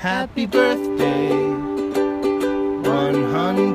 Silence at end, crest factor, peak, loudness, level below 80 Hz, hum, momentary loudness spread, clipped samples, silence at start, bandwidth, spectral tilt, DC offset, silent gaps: 0 s; 16 dB; -2 dBFS; -20 LUFS; -50 dBFS; none; 5 LU; under 0.1%; 0 s; 15.5 kHz; -6.5 dB/octave; under 0.1%; none